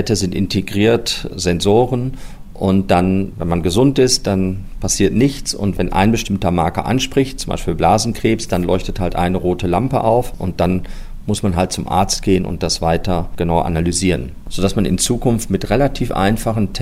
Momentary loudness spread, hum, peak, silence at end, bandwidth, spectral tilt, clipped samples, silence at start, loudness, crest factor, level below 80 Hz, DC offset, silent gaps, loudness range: 7 LU; none; -2 dBFS; 0 s; 16 kHz; -5 dB/octave; under 0.1%; 0 s; -17 LUFS; 14 dB; -30 dBFS; under 0.1%; none; 2 LU